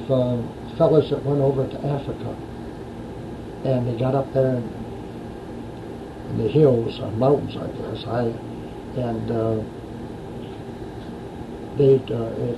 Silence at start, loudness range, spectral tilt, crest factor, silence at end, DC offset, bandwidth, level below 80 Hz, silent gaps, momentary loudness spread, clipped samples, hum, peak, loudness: 0 s; 5 LU; -9 dB/octave; 20 dB; 0 s; under 0.1%; 12 kHz; -46 dBFS; none; 17 LU; under 0.1%; none; -4 dBFS; -23 LUFS